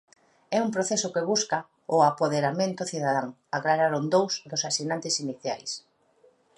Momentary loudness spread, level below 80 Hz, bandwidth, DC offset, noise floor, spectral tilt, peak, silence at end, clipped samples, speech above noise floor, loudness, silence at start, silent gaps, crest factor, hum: 9 LU; -76 dBFS; 11.5 kHz; under 0.1%; -62 dBFS; -3.5 dB/octave; -8 dBFS; 0.8 s; under 0.1%; 36 dB; -26 LUFS; 0.5 s; none; 20 dB; none